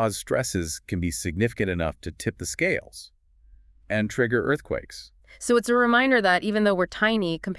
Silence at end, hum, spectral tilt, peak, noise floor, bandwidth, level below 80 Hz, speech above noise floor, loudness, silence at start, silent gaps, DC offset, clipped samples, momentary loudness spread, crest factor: 0 s; none; -4.5 dB/octave; -8 dBFS; -54 dBFS; 12 kHz; -50 dBFS; 30 dB; -24 LUFS; 0 s; none; under 0.1%; under 0.1%; 13 LU; 18 dB